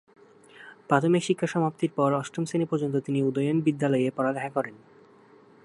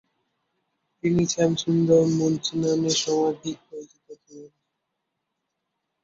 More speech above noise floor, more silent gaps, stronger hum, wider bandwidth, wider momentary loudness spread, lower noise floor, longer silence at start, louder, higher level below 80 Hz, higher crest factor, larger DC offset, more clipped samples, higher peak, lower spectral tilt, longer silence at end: second, 29 dB vs 57 dB; neither; neither; first, 11.5 kHz vs 7.8 kHz; second, 6 LU vs 15 LU; second, -55 dBFS vs -80 dBFS; second, 0.6 s vs 1.05 s; second, -26 LUFS vs -23 LUFS; second, -74 dBFS vs -58 dBFS; about the same, 20 dB vs 18 dB; neither; neither; about the same, -6 dBFS vs -6 dBFS; first, -6.5 dB/octave vs -5 dB/octave; second, 0.85 s vs 1.55 s